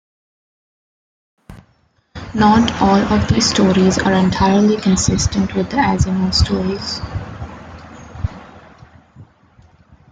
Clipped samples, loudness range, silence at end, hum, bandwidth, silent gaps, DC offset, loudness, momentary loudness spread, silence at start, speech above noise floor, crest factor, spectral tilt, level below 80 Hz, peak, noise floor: under 0.1%; 11 LU; 0.9 s; none; 9.4 kHz; none; under 0.1%; -15 LUFS; 19 LU; 1.5 s; 44 dB; 16 dB; -5 dB/octave; -34 dBFS; -2 dBFS; -58 dBFS